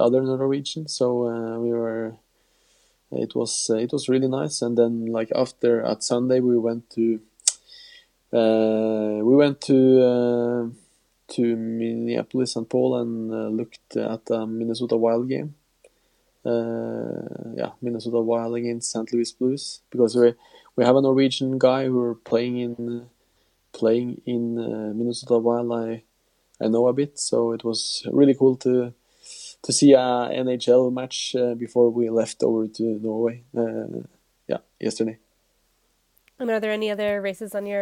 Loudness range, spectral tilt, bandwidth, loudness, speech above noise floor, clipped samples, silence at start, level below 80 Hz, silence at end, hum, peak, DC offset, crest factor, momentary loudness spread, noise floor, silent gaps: 7 LU; -5 dB/octave; 12.5 kHz; -23 LUFS; 45 dB; under 0.1%; 0 s; -70 dBFS; 0 s; none; 0 dBFS; under 0.1%; 22 dB; 12 LU; -67 dBFS; none